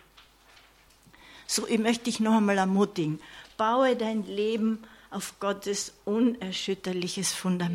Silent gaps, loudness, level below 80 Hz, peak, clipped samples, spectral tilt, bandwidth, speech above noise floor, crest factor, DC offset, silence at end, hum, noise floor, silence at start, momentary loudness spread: none; -28 LUFS; -66 dBFS; -12 dBFS; under 0.1%; -4.5 dB/octave; 16 kHz; 31 dB; 16 dB; under 0.1%; 0 s; none; -58 dBFS; 1.3 s; 12 LU